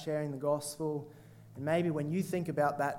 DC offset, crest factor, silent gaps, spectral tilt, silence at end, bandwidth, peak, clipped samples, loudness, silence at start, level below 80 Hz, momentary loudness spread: under 0.1%; 16 dB; none; -6 dB/octave; 0 s; 17 kHz; -16 dBFS; under 0.1%; -34 LUFS; 0 s; -72 dBFS; 10 LU